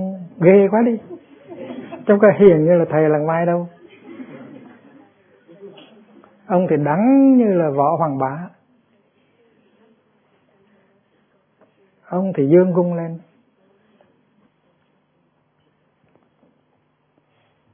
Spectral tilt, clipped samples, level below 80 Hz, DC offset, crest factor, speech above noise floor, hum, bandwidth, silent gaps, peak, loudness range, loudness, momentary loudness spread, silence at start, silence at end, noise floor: -13 dB/octave; under 0.1%; -64 dBFS; under 0.1%; 20 dB; 49 dB; none; 3.6 kHz; none; 0 dBFS; 12 LU; -16 LUFS; 24 LU; 0 s; 4.55 s; -64 dBFS